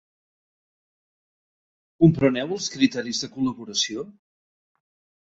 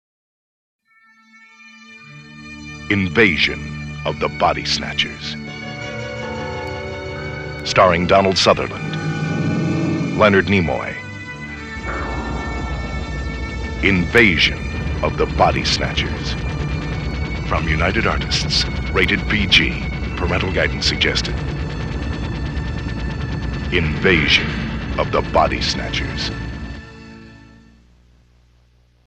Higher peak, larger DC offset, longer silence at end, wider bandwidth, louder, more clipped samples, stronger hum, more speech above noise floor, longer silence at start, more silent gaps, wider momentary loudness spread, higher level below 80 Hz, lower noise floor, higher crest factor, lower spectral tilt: second, -4 dBFS vs 0 dBFS; neither; second, 1.1 s vs 1.65 s; second, 8 kHz vs 10.5 kHz; second, -23 LUFS vs -19 LUFS; neither; second, none vs 60 Hz at -45 dBFS; first, over 68 dB vs 37 dB; first, 2 s vs 1.6 s; neither; second, 10 LU vs 15 LU; second, -56 dBFS vs -30 dBFS; first, under -90 dBFS vs -54 dBFS; about the same, 22 dB vs 20 dB; about the same, -5 dB/octave vs -5 dB/octave